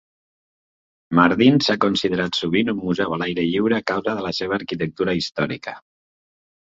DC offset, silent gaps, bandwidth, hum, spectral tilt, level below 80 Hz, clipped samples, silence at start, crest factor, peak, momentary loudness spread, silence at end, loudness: under 0.1%; none; 7.8 kHz; none; -6 dB/octave; -54 dBFS; under 0.1%; 1.1 s; 20 dB; 0 dBFS; 9 LU; 0.9 s; -20 LUFS